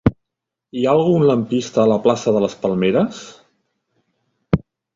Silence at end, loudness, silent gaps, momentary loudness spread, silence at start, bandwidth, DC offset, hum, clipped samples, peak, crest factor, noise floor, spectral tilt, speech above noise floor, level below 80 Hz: 0.4 s; -18 LUFS; none; 7 LU; 0.05 s; 7.8 kHz; under 0.1%; none; under 0.1%; -2 dBFS; 18 dB; -82 dBFS; -7 dB/octave; 65 dB; -42 dBFS